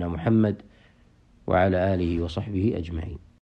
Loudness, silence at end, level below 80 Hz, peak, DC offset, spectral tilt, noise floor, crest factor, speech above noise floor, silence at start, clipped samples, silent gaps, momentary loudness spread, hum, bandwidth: -25 LUFS; 0.4 s; -44 dBFS; -8 dBFS; under 0.1%; -9 dB/octave; -57 dBFS; 16 dB; 33 dB; 0 s; under 0.1%; none; 16 LU; none; 8.2 kHz